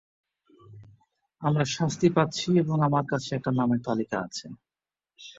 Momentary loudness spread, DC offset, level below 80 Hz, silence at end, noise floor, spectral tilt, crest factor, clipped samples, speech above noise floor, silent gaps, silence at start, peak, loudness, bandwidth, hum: 11 LU; under 0.1%; -64 dBFS; 0.05 s; under -90 dBFS; -6 dB/octave; 18 dB; under 0.1%; over 65 dB; none; 0.7 s; -8 dBFS; -26 LUFS; 7.8 kHz; none